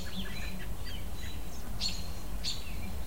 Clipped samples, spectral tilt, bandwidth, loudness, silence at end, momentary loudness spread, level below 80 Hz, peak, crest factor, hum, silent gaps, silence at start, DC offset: under 0.1%; -3.5 dB/octave; 16 kHz; -39 LUFS; 0 s; 7 LU; -42 dBFS; -20 dBFS; 18 dB; none; none; 0 s; 2%